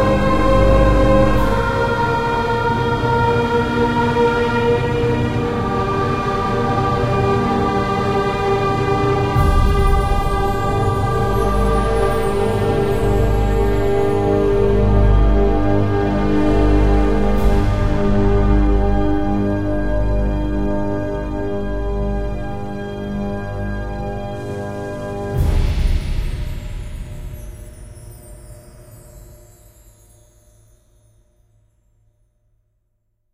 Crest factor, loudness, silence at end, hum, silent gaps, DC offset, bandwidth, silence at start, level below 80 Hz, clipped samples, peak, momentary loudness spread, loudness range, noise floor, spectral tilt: 16 dB; -18 LUFS; 4 s; none; none; under 0.1%; 14.5 kHz; 0 s; -22 dBFS; under 0.1%; 0 dBFS; 11 LU; 9 LU; -67 dBFS; -7.5 dB/octave